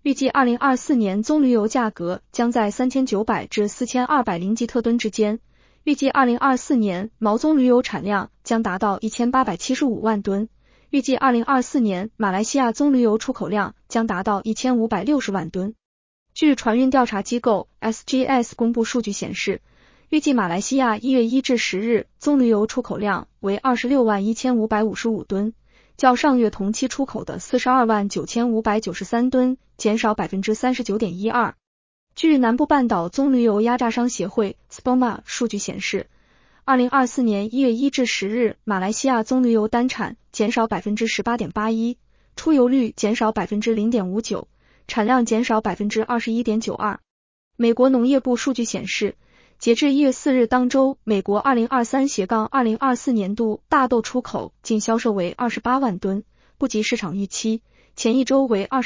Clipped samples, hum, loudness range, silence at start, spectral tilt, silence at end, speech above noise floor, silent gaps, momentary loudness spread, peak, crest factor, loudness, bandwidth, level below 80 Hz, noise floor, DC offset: under 0.1%; none; 2 LU; 0.05 s; -5 dB/octave; 0 s; 36 dB; 15.85-16.26 s, 31.67-32.07 s, 47.10-47.51 s; 8 LU; -2 dBFS; 18 dB; -21 LUFS; 7.6 kHz; -54 dBFS; -56 dBFS; under 0.1%